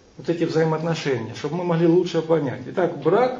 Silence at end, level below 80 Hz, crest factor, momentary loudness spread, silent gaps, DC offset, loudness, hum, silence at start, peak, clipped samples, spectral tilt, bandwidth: 0 s; -62 dBFS; 16 dB; 8 LU; none; under 0.1%; -22 LUFS; none; 0.2 s; -6 dBFS; under 0.1%; -7 dB/octave; 7.6 kHz